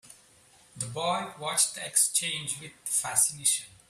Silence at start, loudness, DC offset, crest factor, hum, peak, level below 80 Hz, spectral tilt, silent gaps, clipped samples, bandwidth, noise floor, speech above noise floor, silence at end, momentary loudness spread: 0.05 s; -26 LUFS; under 0.1%; 22 dB; none; -8 dBFS; -72 dBFS; -0.5 dB/octave; none; under 0.1%; 15.5 kHz; -59 dBFS; 30 dB; 0.2 s; 12 LU